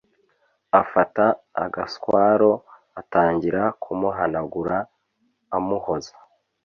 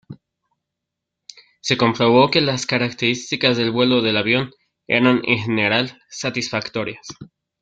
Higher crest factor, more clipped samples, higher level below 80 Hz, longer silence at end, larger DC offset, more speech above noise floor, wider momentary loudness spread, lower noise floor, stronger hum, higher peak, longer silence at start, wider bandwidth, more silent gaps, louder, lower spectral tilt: about the same, 20 dB vs 18 dB; neither; about the same, -56 dBFS vs -58 dBFS; first, 0.55 s vs 0.4 s; neither; second, 48 dB vs 63 dB; about the same, 11 LU vs 13 LU; second, -69 dBFS vs -82 dBFS; neither; about the same, -2 dBFS vs -2 dBFS; first, 0.75 s vs 0.1 s; second, 7 kHz vs 9 kHz; neither; second, -22 LUFS vs -18 LUFS; first, -7 dB/octave vs -4.5 dB/octave